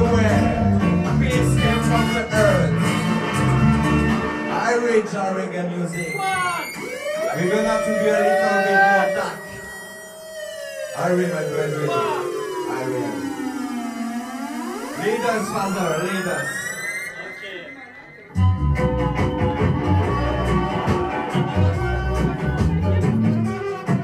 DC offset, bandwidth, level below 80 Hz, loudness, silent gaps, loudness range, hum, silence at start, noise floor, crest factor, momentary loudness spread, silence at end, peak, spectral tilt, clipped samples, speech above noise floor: under 0.1%; 15.5 kHz; -34 dBFS; -21 LUFS; none; 6 LU; none; 0 s; -41 dBFS; 16 dB; 12 LU; 0 s; -4 dBFS; -6 dB/octave; under 0.1%; 21 dB